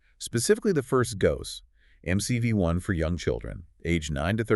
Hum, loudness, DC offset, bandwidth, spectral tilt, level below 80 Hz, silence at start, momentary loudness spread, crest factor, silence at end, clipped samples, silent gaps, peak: none; -27 LUFS; under 0.1%; 12 kHz; -5.5 dB/octave; -44 dBFS; 0.2 s; 13 LU; 18 dB; 0 s; under 0.1%; none; -8 dBFS